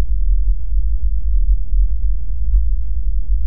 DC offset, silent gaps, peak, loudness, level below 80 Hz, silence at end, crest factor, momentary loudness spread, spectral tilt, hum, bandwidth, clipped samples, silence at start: 20%; none; -4 dBFS; -22 LUFS; -16 dBFS; 0 s; 10 dB; 4 LU; -14.5 dB/octave; none; 0.5 kHz; under 0.1%; 0 s